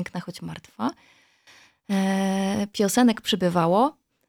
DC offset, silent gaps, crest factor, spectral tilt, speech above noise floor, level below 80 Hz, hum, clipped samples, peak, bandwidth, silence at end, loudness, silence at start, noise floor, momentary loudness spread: under 0.1%; none; 18 dB; -5 dB/octave; 32 dB; -64 dBFS; none; under 0.1%; -6 dBFS; 17 kHz; 0.35 s; -23 LUFS; 0 s; -55 dBFS; 14 LU